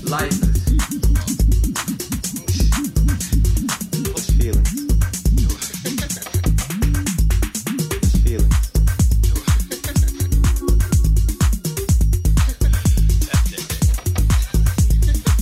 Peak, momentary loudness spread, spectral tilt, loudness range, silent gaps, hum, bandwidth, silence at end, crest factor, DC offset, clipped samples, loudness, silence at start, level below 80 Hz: -4 dBFS; 5 LU; -5 dB/octave; 2 LU; none; none; 16 kHz; 0 s; 12 dB; under 0.1%; under 0.1%; -19 LUFS; 0 s; -18 dBFS